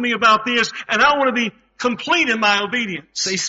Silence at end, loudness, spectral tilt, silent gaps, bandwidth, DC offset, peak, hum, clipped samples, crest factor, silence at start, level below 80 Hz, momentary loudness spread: 0 s; -17 LUFS; -0.5 dB/octave; none; 8 kHz; under 0.1%; -4 dBFS; none; under 0.1%; 16 dB; 0 s; -58 dBFS; 9 LU